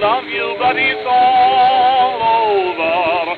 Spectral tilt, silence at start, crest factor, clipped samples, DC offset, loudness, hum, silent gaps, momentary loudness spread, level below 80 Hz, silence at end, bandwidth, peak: -5.5 dB/octave; 0 s; 10 dB; under 0.1%; under 0.1%; -14 LUFS; none; none; 5 LU; -54 dBFS; 0 s; 4.9 kHz; -4 dBFS